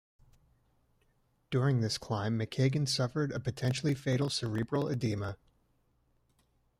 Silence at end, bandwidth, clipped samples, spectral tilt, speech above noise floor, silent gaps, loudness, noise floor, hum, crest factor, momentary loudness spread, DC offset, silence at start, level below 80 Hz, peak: 1.45 s; 14 kHz; under 0.1%; -5.5 dB/octave; 41 dB; none; -32 LUFS; -72 dBFS; none; 18 dB; 5 LU; under 0.1%; 1.5 s; -62 dBFS; -16 dBFS